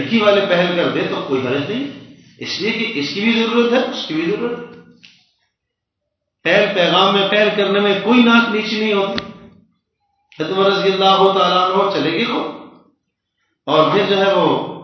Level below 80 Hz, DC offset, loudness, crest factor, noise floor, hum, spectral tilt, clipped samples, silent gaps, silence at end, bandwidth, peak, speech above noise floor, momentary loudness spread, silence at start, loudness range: -60 dBFS; under 0.1%; -15 LUFS; 16 dB; -78 dBFS; none; -5.5 dB/octave; under 0.1%; none; 0 s; 6.4 kHz; 0 dBFS; 62 dB; 12 LU; 0 s; 5 LU